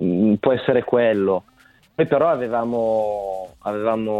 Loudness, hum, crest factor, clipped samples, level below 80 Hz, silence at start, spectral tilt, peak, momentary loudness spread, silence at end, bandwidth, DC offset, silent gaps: -20 LUFS; none; 16 dB; under 0.1%; -56 dBFS; 0 s; -8.5 dB/octave; -4 dBFS; 10 LU; 0 s; 9 kHz; under 0.1%; none